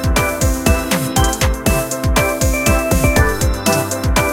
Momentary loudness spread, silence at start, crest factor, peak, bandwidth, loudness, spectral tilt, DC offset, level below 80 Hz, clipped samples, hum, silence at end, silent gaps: 3 LU; 0 s; 14 dB; 0 dBFS; 17 kHz; -15 LUFS; -4.5 dB/octave; under 0.1%; -20 dBFS; under 0.1%; none; 0 s; none